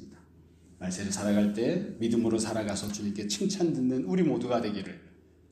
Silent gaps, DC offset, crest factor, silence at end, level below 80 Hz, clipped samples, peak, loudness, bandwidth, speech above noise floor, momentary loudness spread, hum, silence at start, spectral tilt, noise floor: none; under 0.1%; 16 dB; 0.45 s; -62 dBFS; under 0.1%; -14 dBFS; -29 LUFS; 15 kHz; 28 dB; 9 LU; none; 0 s; -5.5 dB/octave; -57 dBFS